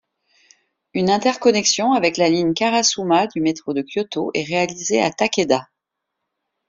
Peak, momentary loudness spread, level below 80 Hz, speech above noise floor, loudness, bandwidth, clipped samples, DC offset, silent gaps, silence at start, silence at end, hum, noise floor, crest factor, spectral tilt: -2 dBFS; 7 LU; -62 dBFS; 61 dB; -19 LUFS; 7.8 kHz; under 0.1%; under 0.1%; none; 0.95 s; 1.05 s; none; -80 dBFS; 18 dB; -3.5 dB/octave